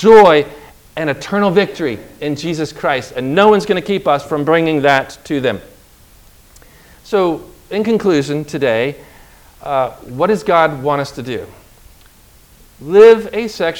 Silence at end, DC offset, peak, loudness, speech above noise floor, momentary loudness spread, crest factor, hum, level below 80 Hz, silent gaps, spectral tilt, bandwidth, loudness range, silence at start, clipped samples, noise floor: 0 s; under 0.1%; 0 dBFS; -14 LUFS; 32 dB; 15 LU; 14 dB; none; -48 dBFS; none; -6 dB/octave; 17 kHz; 5 LU; 0 s; 0.7%; -45 dBFS